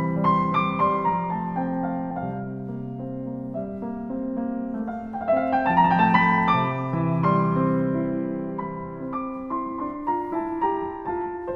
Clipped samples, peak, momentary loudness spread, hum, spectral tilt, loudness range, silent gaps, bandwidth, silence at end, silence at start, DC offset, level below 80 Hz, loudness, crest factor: under 0.1%; -4 dBFS; 13 LU; none; -9.5 dB/octave; 9 LU; none; 5.8 kHz; 0 s; 0 s; under 0.1%; -52 dBFS; -25 LUFS; 20 dB